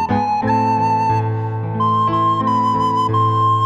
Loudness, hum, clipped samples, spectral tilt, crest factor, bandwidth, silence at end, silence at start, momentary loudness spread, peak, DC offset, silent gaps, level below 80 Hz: -17 LUFS; none; under 0.1%; -7.5 dB/octave; 10 dB; 7.8 kHz; 0 s; 0 s; 4 LU; -6 dBFS; under 0.1%; none; -48 dBFS